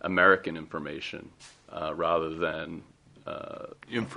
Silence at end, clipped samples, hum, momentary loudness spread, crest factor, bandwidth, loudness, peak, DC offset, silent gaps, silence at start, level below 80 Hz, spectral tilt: 0 s; under 0.1%; none; 22 LU; 24 dB; 10.5 kHz; -29 LUFS; -6 dBFS; under 0.1%; none; 0 s; -62 dBFS; -5.5 dB/octave